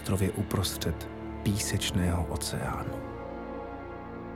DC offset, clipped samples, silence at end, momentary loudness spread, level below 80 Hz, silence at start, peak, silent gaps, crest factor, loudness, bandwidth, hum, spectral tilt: under 0.1%; under 0.1%; 0 s; 11 LU; -44 dBFS; 0 s; -14 dBFS; none; 18 dB; -32 LUFS; 17 kHz; none; -5 dB/octave